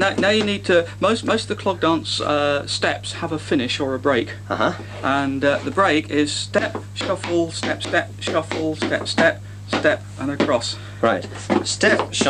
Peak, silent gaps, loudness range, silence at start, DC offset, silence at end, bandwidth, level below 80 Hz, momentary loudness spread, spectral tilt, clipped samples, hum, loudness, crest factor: -2 dBFS; none; 1 LU; 0 s; under 0.1%; 0 s; 12.5 kHz; -52 dBFS; 8 LU; -4 dB/octave; under 0.1%; 50 Hz at -35 dBFS; -21 LUFS; 18 dB